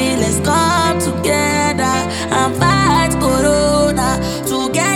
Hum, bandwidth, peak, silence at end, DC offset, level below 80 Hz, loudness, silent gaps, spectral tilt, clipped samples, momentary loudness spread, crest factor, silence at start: none; 18 kHz; 0 dBFS; 0 s; under 0.1%; -32 dBFS; -14 LUFS; none; -4 dB/octave; under 0.1%; 4 LU; 14 dB; 0 s